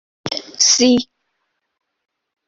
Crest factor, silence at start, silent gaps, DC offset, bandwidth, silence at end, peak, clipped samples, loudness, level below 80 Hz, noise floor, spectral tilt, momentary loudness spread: 18 dB; 0.25 s; none; under 0.1%; 7.8 kHz; 1.45 s; -2 dBFS; under 0.1%; -14 LUFS; -60 dBFS; -72 dBFS; -1.5 dB/octave; 15 LU